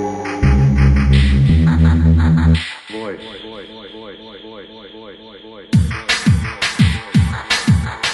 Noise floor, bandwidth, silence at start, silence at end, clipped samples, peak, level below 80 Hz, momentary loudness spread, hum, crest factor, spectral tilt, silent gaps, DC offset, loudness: -37 dBFS; 11.5 kHz; 0 s; 0 s; under 0.1%; -2 dBFS; -20 dBFS; 22 LU; none; 14 dB; -6 dB/octave; none; under 0.1%; -15 LUFS